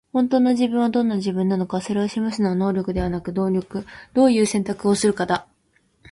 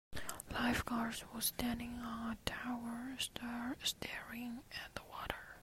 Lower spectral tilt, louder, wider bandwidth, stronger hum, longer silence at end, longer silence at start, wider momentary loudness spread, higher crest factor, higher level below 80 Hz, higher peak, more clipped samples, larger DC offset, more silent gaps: first, -6 dB/octave vs -3 dB/octave; first, -21 LUFS vs -42 LUFS; second, 11.5 kHz vs 16 kHz; neither; first, 0.7 s vs 0 s; about the same, 0.15 s vs 0.1 s; second, 7 LU vs 10 LU; second, 14 dB vs 28 dB; first, -46 dBFS vs -58 dBFS; first, -6 dBFS vs -16 dBFS; neither; neither; neither